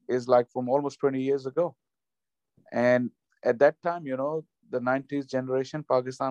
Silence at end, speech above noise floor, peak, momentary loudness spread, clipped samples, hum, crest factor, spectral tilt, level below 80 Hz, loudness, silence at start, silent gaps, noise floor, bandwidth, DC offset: 0 s; over 64 dB; -8 dBFS; 9 LU; under 0.1%; none; 20 dB; -7 dB/octave; -76 dBFS; -27 LUFS; 0.1 s; none; under -90 dBFS; 9.2 kHz; under 0.1%